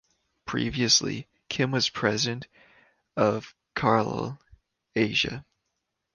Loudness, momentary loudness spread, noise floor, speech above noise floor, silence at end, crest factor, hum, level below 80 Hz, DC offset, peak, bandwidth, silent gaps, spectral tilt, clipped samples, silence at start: -26 LUFS; 16 LU; -81 dBFS; 54 dB; 0.75 s; 22 dB; none; -56 dBFS; under 0.1%; -6 dBFS; 11 kHz; none; -3.5 dB/octave; under 0.1%; 0.45 s